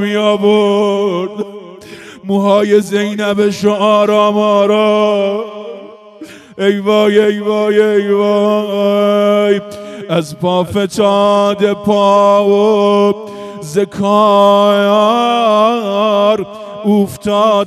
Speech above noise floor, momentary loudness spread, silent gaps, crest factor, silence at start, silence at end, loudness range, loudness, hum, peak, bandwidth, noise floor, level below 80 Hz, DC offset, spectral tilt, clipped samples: 23 dB; 13 LU; none; 12 dB; 0 s; 0 s; 3 LU; -12 LUFS; none; 0 dBFS; 13.5 kHz; -34 dBFS; -56 dBFS; under 0.1%; -6 dB/octave; under 0.1%